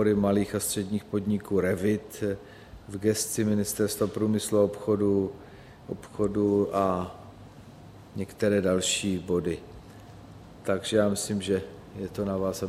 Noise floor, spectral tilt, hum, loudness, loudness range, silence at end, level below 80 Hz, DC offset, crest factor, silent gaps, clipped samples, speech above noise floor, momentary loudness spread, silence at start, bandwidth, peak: -48 dBFS; -5 dB/octave; none; -27 LUFS; 3 LU; 0 s; -56 dBFS; under 0.1%; 18 dB; none; under 0.1%; 21 dB; 22 LU; 0 s; 15.5 kHz; -10 dBFS